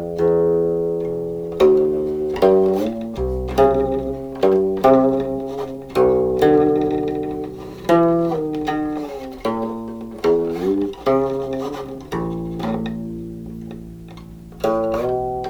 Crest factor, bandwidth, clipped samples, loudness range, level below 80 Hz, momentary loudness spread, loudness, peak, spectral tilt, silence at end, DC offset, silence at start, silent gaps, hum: 18 dB; 19 kHz; under 0.1%; 8 LU; -40 dBFS; 15 LU; -19 LUFS; -2 dBFS; -7.5 dB/octave; 0 s; under 0.1%; 0 s; none; none